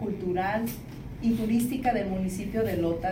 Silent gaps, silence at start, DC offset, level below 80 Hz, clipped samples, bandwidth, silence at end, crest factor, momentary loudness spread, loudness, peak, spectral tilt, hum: none; 0 s; under 0.1%; -46 dBFS; under 0.1%; 16.5 kHz; 0 s; 16 dB; 6 LU; -28 LUFS; -12 dBFS; -6.5 dB/octave; none